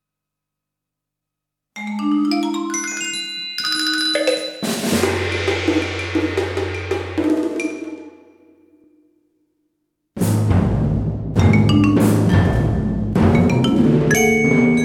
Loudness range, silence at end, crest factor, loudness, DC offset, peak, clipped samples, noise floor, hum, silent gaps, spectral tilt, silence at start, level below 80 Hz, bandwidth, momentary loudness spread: 9 LU; 0 s; 18 dB; -18 LUFS; under 0.1%; -2 dBFS; under 0.1%; -83 dBFS; 50 Hz at -55 dBFS; none; -5.5 dB/octave; 1.75 s; -36 dBFS; 17 kHz; 10 LU